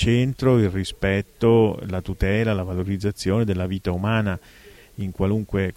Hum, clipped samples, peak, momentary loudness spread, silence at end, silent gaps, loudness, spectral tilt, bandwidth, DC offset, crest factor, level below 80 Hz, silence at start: none; under 0.1%; -6 dBFS; 10 LU; 0.05 s; none; -22 LUFS; -7 dB/octave; 15.5 kHz; under 0.1%; 16 dB; -38 dBFS; 0 s